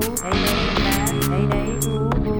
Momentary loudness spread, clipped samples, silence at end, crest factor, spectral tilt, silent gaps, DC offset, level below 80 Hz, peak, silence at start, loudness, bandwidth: 3 LU; under 0.1%; 0 s; 14 dB; -4.5 dB/octave; none; under 0.1%; -28 dBFS; -6 dBFS; 0 s; -20 LUFS; over 20 kHz